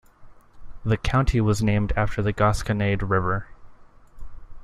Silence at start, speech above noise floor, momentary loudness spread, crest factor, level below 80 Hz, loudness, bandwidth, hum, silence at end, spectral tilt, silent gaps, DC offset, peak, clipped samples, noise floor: 0.2 s; 25 dB; 5 LU; 18 dB; -34 dBFS; -23 LUFS; 12 kHz; none; 0 s; -6.5 dB/octave; none; under 0.1%; -6 dBFS; under 0.1%; -47 dBFS